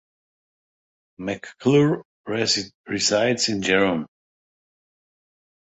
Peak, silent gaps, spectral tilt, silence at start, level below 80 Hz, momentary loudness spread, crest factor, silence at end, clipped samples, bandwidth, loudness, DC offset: -6 dBFS; 2.05-2.24 s, 2.74-2.84 s; -4 dB/octave; 1.2 s; -60 dBFS; 12 LU; 20 dB; 1.7 s; under 0.1%; 8.2 kHz; -22 LUFS; under 0.1%